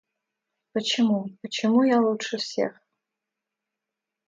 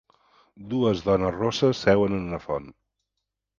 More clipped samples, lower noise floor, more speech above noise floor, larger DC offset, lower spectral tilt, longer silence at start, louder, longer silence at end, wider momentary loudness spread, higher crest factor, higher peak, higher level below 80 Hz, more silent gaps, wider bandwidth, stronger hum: neither; about the same, -86 dBFS vs -83 dBFS; first, 63 dB vs 59 dB; neither; second, -4.5 dB/octave vs -6.5 dB/octave; first, 0.75 s vs 0.6 s; about the same, -24 LUFS vs -24 LUFS; first, 1.55 s vs 0.9 s; about the same, 10 LU vs 10 LU; about the same, 16 dB vs 20 dB; second, -10 dBFS vs -4 dBFS; second, -76 dBFS vs -50 dBFS; neither; about the same, 7.8 kHz vs 7.4 kHz; neither